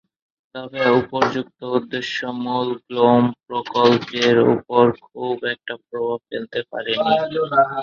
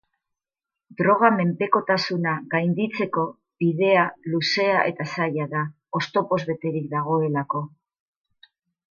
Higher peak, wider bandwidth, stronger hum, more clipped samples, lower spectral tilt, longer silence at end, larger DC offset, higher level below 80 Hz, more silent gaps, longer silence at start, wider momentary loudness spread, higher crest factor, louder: about the same, -2 dBFS vs -4 dBFS; about the same, 7.2 kHz vs 7.2 kHz; neither; neither; about the same, -6 dB/octave vs -6.5 dB/octave; second, 0 s vs 1.25 s; neither; first, -60 dBFS vs -70 dBFS; neither; second, 0.55 s vs 1 s; first, 12 LU vs 9 LU; about the same, 18 dB vs 20 dB; first, -20 LUFS vs -23 LUFS